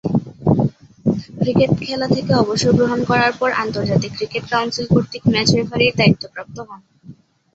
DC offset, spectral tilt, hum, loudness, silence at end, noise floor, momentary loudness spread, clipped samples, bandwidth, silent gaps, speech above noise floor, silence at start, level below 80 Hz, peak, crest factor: under 0.1%; -6 dB/octave; none; -17 LUFS; 0.45 s; -43 dBFS; 8 LU; under 0.1%; 8 kHz; none; 26 dB; 0.05 s; -46 dBFS; -2 dBFS; 16 dB